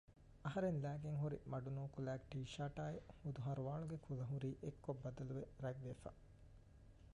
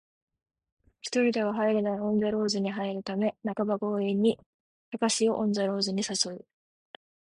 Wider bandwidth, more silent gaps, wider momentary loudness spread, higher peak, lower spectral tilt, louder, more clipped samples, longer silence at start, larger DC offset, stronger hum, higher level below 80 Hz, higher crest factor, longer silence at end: about the same, 10.5 kHz vs 11.5 kHz; second, none vs 4.46-4.92 s; first, 18 LU vs 6 LU; second, -32 dBFS vs -12 dBFS; first, -8 dB/octave vs -4.5 dB/octave; second, -48 LUFS vs -28 LUFS; neither; second, 0.1 s vs 1.05 s; neither; neither; about the same, -66 dBFS vs -70 dBFS; about the same, 16 dB vs 18 dB; second, 0.05 s vs 0.95 s